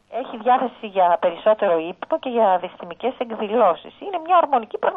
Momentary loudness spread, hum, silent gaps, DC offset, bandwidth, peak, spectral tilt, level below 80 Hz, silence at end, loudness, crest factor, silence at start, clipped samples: 10 LU; none; none; under 0.1%; 4 kHz; -4 dBFS; -7.5 dB/octave; -68 dBFS; 0 s; -21 LUFS; 16 dB; 0.1 s; under 0.1%